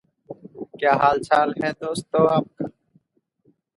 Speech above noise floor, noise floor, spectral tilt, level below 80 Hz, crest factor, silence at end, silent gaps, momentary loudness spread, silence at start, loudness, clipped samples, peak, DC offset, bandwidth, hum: 48 dB; -68 dBFS; -6 dB/octave; -62 dBFS; 20 dB; 1.05 s; none; 21 LU; 0.3 s; -21 LUFS; under 0.1%; -2 dBFS; under 0.1%; 11.5 kHz; none